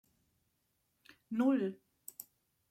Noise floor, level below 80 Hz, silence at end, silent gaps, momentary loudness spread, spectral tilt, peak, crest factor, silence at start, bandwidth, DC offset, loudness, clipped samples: -80 dBFS; -86 dBFS; 0.5 s; none; 20 LU; -6 dB/octave; -22 dBFS; 18 dB; 1.3 s; 16.5 kHz; under 0.1%; -34 LUFS; under 0.1%